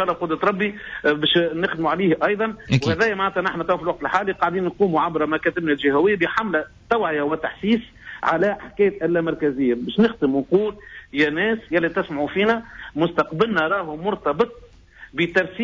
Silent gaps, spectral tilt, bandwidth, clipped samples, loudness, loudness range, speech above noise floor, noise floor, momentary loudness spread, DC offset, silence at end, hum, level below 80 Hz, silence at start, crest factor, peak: none; -6.5 dB/octave; 7.6 kHz; under 0.1%; -21 LUFS; 1 LU; 25 dB; -46 dBFS; 6 LU; under 0.1%; 0 s; none; -50 dBFS; 0 s; 14 dB; -6 dBFS